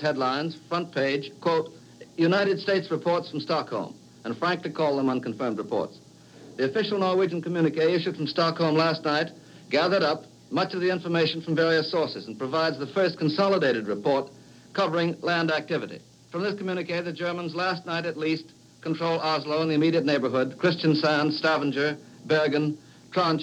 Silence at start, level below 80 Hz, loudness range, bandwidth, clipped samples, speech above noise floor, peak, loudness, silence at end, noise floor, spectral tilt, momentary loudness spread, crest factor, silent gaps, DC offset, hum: 0 s; -74 dBFS; 4 LU; 10 kHz; under 0.1%; 23 dB; -10 dBFS; -26 LUFS; 0 s; -49 dBFS; -6 dB/octave; 9 LU; 16 dB; none; under 0.1%; none